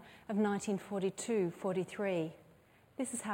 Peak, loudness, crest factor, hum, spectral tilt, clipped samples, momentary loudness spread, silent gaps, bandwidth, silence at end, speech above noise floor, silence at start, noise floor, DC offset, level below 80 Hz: -22 dBFS; -37 LUFS; 14 dB; none; -5.5 dB/octave; under 0.1%; 7 LU; none; 16.5 kHz; 0 s; 29 dB; 0 s; -64 dBFS; under 0.1%; -76 dBFS